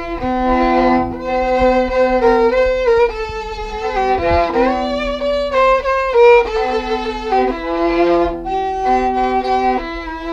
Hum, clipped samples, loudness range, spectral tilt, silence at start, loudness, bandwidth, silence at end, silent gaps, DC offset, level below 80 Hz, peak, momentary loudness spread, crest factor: none; under 0.1%; 2 LU; -6 dB/octave; 0 s; -15 LUFS; 7.8 kHz; 0 s; none; under 0.1%; -32 dBFS; -2 dBFS; 8 LU; 14 dB